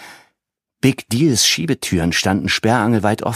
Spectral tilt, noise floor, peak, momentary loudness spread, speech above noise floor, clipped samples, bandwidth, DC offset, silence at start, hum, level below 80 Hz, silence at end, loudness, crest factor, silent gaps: -4 dB/octave; -78 dBFS; 0 dBFS; 5 LU; 62 dB; under 0.1%; 15.5 kHz; under 0.1%; 0 s; none; -44 dBFS; 0 s; -16 LUFS; 16 dB; none